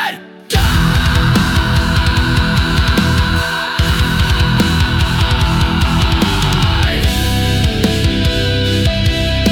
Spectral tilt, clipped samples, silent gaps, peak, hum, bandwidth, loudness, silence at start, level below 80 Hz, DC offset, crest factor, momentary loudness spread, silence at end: -5 dB/octave; under 0.1%; none; -2 dBFS; none; 18 kHz; -14 LUFS; 0 s; -18 dBFS; under 0.1%; 12 dB; 2 LU; 0 s